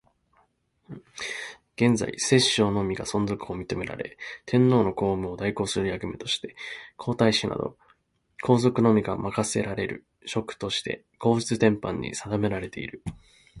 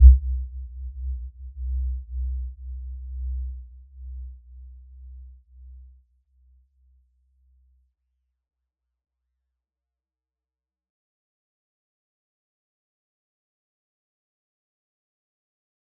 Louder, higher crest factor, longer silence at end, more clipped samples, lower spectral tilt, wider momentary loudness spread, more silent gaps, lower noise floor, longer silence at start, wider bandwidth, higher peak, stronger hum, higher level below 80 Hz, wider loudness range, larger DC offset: first, -26 LUFS vs -29 LUFS; about the same, 22 dB vs 26 dB; second, 0 s vs 10.15 s; neither; second, -5 dB/octave vs -20.5 dB/octave; about the same, 15 LU vs 17 LU; neither; second, -67 dBFS vs under -90 dBFS; first, 0.9 s vs 0 s; first, 11.5 kHz vs 0.2 kHz; about the same, -4 dBFS vs -2 dBFS; neither; second, -52 dBFS vs -28 dBFS; second, 3 LU vs 19 LU; neither